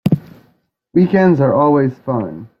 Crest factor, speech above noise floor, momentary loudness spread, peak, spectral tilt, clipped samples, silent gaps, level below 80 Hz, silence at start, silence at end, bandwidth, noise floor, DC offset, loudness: 14 dB; 45 dB; 9 LU; -2 dBFS; -10 dB/octave; under 0.1%; none; -52 dBFS; 0.05 s; 0.15 s; 5.6 kHz; -58 dBFS; under 0.1%; -15 LUFS